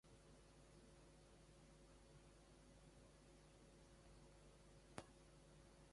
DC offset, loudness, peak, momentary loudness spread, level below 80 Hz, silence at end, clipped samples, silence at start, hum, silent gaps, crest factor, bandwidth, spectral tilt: under 0.1%; -67 LUFS; -32 dBFS; 7 LU; -72 dBFS; 0 s; under 0.1%; 0.05 s; none; none; 34 dB; 11.5 kHz; -4.5 dB/octave